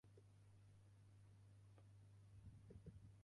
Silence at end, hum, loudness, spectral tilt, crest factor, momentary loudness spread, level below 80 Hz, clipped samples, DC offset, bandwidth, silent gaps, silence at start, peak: 0 s; 50 Hz at -65 dBFS; -67 LUFS; -7 dB/octave; 18 dB; 6 LU; -76 dBFS; under 0.1%; under 0.1%; 11 kHz; none; 0.05 s; -48 dBFS